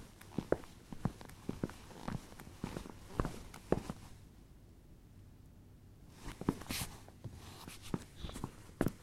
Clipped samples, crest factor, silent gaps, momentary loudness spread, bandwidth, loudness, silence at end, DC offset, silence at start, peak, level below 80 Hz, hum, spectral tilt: under 0.1%; 28 dB; none; 21 LU; 16 kHz; -44 LUFS; 0 s; under 0.1%; 0 s; -16 dBFS; -54 dBFS; none; -5.5 dB/octave